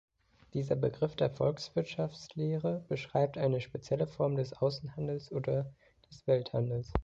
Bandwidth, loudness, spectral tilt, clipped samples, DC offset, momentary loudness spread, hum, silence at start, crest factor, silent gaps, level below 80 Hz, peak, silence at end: 7.8 kHz; -34 LUFS; -7.5 dB/octave; under 0.1%; under 0.1%; 7 LU; none; 0.55 s; 24 dB; none; -54 dBFS; -10 dBFS; 0 s